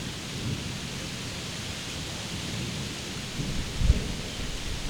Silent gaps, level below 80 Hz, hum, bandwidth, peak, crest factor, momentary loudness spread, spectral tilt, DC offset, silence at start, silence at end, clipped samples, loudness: none; -34 dBFS; none; 19.5 kHz; -6 dBFS; 24 dB; 6 LU; -4 dB/octave; under 0.1%; 0 s; 0 s; under 0.1%; -32 LUFS